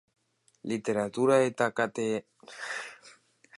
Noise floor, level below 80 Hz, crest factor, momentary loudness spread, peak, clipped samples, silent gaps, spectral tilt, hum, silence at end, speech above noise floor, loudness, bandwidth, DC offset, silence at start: -58 dBFS; -76 dBFS; 20 dB; 18 LU; -10 dBFS; under 0.1%; none; -5 dB/octave; none; 0.5 s; 29 dB; -29 LUFS; 11.5 kHz; under 0.1%; 0.65 s